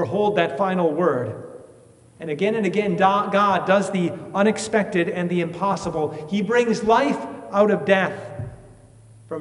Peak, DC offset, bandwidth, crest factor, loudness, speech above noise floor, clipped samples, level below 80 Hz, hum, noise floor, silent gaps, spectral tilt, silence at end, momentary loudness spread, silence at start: -2 dBFS; under 0.1%; 11.5 kHz; 20 dB; -21 LUFS; 29 dB; under 0.1%; -58 dBFS; none; -50 dBFS; none; -6 dB/octave; 0 s; 13 LU; 0 s